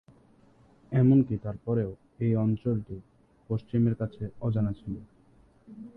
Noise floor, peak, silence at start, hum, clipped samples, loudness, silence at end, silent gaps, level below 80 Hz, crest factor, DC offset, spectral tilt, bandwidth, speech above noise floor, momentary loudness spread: -60 dBFS; -12 dBFS; 0.9 s; none; under 0.1%; -28 LUFS; 0.05 s; none; -54 dBFS; 18 dB; under 0.1%; -12 dB/octave; 4 kHz; 33 dB; 17 LU